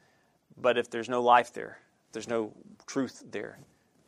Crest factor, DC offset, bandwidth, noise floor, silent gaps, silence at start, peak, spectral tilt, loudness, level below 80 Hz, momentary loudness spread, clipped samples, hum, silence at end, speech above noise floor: 24 dB; under 0.1%; 12.5 kHz; -67 dBFS; none; 0.55 s; -8 dBFS; -4 dB/octave; -29 LUFS; -78 dBFS; 21 LU; under 0.1%; none; 0.55 s; 38 dB